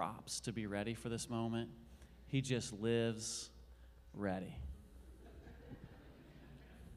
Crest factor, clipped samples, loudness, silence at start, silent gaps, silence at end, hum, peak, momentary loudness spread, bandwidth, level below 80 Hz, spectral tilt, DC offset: 20 dB; under 0.1%; -42 LUFS; 0 s; none; 0 s; none; -24 dBFS; 22 LU; 15.5 kHz; -60 dBFS; -5 dB/octave; under 0.1%